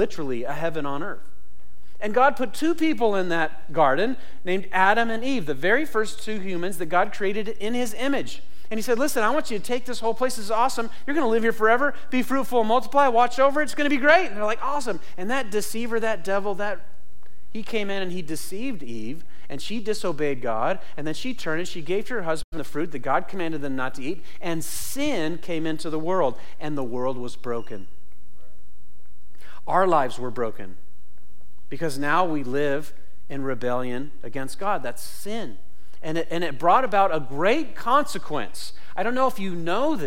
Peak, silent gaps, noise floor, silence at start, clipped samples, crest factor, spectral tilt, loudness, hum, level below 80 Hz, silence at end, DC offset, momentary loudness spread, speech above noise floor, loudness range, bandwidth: -6 dBFS; 22.44-22.52 s; -57 dBFS; 0 s; under 0.1%; 18 dB; -4.5 dB/octave; -25 LUFS; none; -52 dBFS; 0 s; 8%; 14 LU; 32 dB; 8 LU; 16.5 kHz